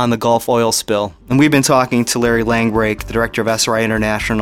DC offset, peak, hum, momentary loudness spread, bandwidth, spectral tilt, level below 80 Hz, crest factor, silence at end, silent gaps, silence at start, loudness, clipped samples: under 0.1%; 0 dBFS; none; 5 LU; 17 kHz; -4.5 dB/octave; -36 dBFS; 14 dB; 0 s; none; 0 s; -15 LUFS; under 0.1%